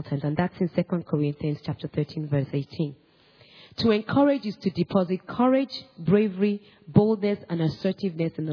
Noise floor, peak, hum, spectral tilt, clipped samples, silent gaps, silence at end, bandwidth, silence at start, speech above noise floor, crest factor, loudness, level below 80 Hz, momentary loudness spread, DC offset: -56 dBFS; -4 dBFS; none; -9 dB/octave; under 0.1%; none; 0 s; 5.4 kHz; 0 s; 31 dB; 22 dB; -26 LUFS; -58 dBFS; 9 LU; under 0.1%